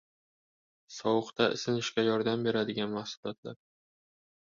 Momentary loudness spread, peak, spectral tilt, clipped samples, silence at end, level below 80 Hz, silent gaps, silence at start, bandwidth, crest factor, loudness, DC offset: 13 LU; -12 dBFS; -5 dB/octave; under 0.1%; 1.05 s; -72 dBFS; 3.17-3.23 s, 3.38-3.43 s; 0.9 s; 7.6 kHz; 22 dB; -31 LUFS; under 0.1%